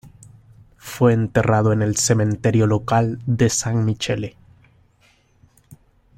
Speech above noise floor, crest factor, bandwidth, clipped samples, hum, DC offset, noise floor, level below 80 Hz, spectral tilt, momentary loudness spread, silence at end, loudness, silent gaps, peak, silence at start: 40 dB; 18 dB; 16 kHz; under 0.1%; none; under 0.1%; -58 dBFS; -48 dBFS; -5.5 dB/octave; 8 LU; 1.9 s; -19 LUFS; none; -2 dBFS; 0.05 s